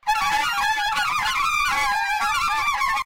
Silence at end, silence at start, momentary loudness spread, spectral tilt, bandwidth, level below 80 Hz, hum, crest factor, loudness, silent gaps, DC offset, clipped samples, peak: 0 s; 0.05 s; 1 LU; 0.5 dB/octave; 17 kHz; -46 dBFS; none; 12 dB; -21 LUFS; none; under 0.1%; under 0.1%; -10 dBFS